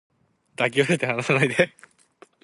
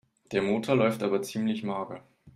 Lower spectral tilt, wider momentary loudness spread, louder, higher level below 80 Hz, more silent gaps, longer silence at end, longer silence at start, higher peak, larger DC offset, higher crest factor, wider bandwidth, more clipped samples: about the same, -5 dB/octave vs -6 dB/octave; second, 4 LU vs 11 LU; first, -22 LUFS vs -28 LUFS; about the same, -64 dBFS vs -68 dBFS; neither; first, 0.75 s vs 0.05 s; first, 0.6 s vs 0.3 s; first, -4 dBFS vs -10 dBFS; neither; about the same, 22 dB vs 18 dB; second, 11.5 kHz vs 15.5 kHz; neither